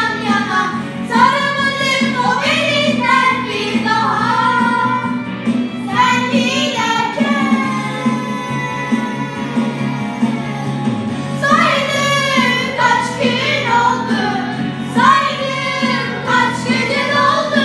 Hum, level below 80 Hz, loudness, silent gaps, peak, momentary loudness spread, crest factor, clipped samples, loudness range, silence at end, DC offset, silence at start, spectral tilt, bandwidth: none; -54 dBFS; -15 LUFS; none; 0 dBFS; 8 LU; 14 dB; under 0.1%; 4 LU; 0 s; under 0.1%; 0 s; -4.5 dB/octave; 12.5 kHz